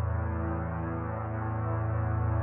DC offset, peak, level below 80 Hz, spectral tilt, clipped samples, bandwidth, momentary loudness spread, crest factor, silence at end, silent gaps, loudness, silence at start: under 0.1%; -20 dBFS; -44 dBFS; -12.5 dB/octave; under 0.1%; 2.9 kHz; 4 LU; 10 dB; 0 s; none; -32 LUFS; 0 s